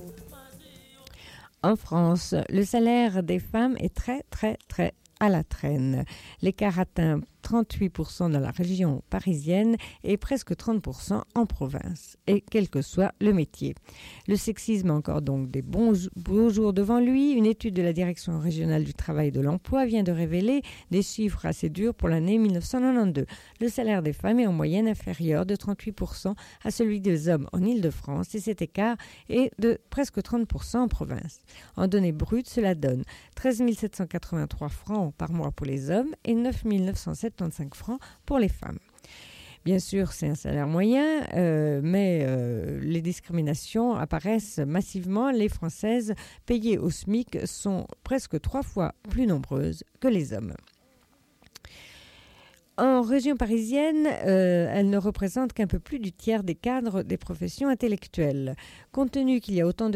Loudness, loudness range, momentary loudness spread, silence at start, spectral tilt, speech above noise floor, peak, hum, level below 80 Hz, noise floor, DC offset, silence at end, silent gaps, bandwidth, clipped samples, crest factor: -27 LUFS; 5 LU; 10 LU; 0 s; -7 dB/octave; 37 dB; -12 dBFS; none; -44 dBFS; -63 dBFS; under 0.1%; 0 s; none; 15.5 kHz; under 0.1%; 14 dB